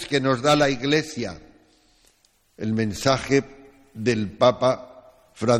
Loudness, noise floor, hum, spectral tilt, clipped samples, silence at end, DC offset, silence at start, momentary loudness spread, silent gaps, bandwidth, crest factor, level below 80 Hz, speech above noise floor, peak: -22 LUFS; -63 dBFS; none; -5 dB/octave; under 0.1%; 0 s; under 0.1%; 0 s; 13 LU; none; 15.5 kHz; 20 dB; -52 dBFS; 41 dB; -4 dBFS